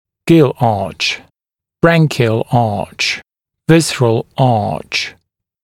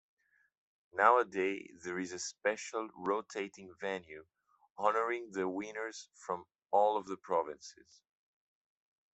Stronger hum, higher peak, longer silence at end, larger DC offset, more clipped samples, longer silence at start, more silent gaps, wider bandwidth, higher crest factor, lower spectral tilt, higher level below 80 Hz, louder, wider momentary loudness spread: neither; first, 0 dBFS vs -10 dBFS; second, 0.5 s vs 1.4 s; neither; neither; second, 0.25 s vs 0.95 s; second, none vs 4.70-4.76 s, 6.55-6.59 s; first, 15.5 kHz vs 8.2 kHz; second, 14 dB vs 26 dB; first, -5.5 dB/octave vs -3.5 dB/octave; first, -46 dBFS vs -82 dBFS; first, -14 LUFS vs -35 LUFS; second, 8 LU vs 14 LU